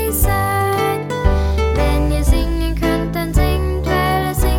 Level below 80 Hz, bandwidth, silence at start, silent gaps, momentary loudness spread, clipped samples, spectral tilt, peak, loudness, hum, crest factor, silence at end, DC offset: -18 dBFS; 19.5 kHz; 0 s; none; 3 LU; under 0.1%; -5.5 dB/octave; -2 dBFS; -17 LUFS; none; 14 dB; 0 s; under 0.1%